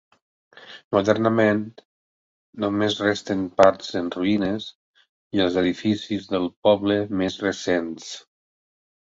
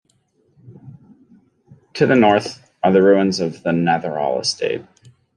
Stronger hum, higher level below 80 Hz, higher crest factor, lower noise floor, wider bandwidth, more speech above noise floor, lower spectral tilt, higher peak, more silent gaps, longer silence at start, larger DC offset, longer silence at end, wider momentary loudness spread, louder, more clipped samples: neither; first, -56 dBFS vs -62 dBFS; about the same, 22 dB vs 18 dB; first, under -90 dBFS vs -62 dBFS; second, 8 kHz vs 11 kHz; first, over 68 dB vs 46 dB; about the same, -5.5 dB/octave vs -5.5 dB/octave; about the same, -2 dBFS vs -2 dBFS; first, 0.84-0.91 s, 1.85-2.53 s, 4.75-4.94 s, 5.09-5.31 s, 6.56-6.63 s vs none; about the same, 0.6 s vs 0.7 s; neither; first, 0.9 s vs 0.55 s; first, 15 LU vs 11 LU; second, -22 LUFS vs -17 LUFS; neither